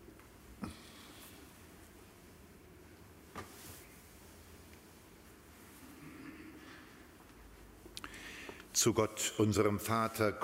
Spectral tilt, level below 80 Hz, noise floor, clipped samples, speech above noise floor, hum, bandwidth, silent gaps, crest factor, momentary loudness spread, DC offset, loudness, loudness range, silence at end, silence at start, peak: -4 dB/octave; -64 dBFS; -58 dBFS; under 0.1%; 25 dB; none; 16 kHz; none; 22 dB; 26 LU; under 0.1%; -35 LUFS; 19 LU; 0 s; 0 s; -18 dBFS